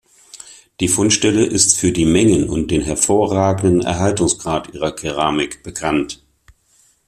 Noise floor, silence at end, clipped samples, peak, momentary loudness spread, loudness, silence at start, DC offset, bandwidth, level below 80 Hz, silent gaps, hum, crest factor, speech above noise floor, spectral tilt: -56 dBFS; 0.9 s; under 0.1%; 0 dBFS; 11 LU; -16 LUFS; 0.35 s; under 0.1%; 14 kHz; -40 dBFS; none; none; 18 dB; 40 dB; -4 dB/octave